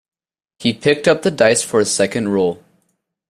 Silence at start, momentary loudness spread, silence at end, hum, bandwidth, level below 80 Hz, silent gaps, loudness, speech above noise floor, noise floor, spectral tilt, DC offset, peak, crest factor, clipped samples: 0.6 s; 7 LU; 0.75 s; none; 15 kHz; -56 dBFS; none; -16 LUFS; 52 dB; -67 dBFS; -4 dB/octave; under 0.1%; 0 dBFS; 18 dB; under 0.1%